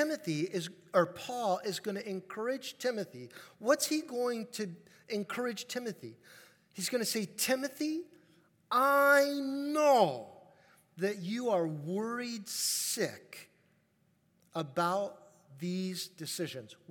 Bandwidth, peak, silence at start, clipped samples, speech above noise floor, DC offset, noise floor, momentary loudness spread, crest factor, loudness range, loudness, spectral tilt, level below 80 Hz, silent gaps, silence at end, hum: 18 kHz; -12 dBFS; 0 s; under 0.1%; 39 dB; under 0.1%; -72 dBFS; 16 LU; 22 dB; 8 LU; -33 LUFS; -3.5 dB/octave; -90 dBFS; none; 0.15 s; none